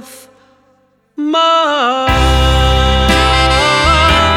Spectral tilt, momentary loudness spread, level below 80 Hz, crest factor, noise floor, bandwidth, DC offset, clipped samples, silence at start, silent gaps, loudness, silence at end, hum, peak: -4.5 dB/octave; 4 LU; -18 dBFS; 12 dB; -54 dBFS; 14.5 kHz; under 0.1%; under 0.1%; 0 s; none; -11 LUFS; 0 s; none; 0 dBFS